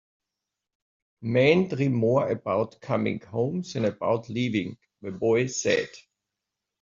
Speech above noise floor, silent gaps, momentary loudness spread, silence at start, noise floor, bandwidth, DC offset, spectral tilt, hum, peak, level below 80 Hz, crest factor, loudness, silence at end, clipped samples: 61 dB; none; 9 LU; 1.2 s; -86 dBFS; 7.8 kHz; under 0.1%; -5.5 dB/octave; none; -6 dBFS; -64 dBFS; 20 dB; -26 LUFS; 0.8 s; under 0.1%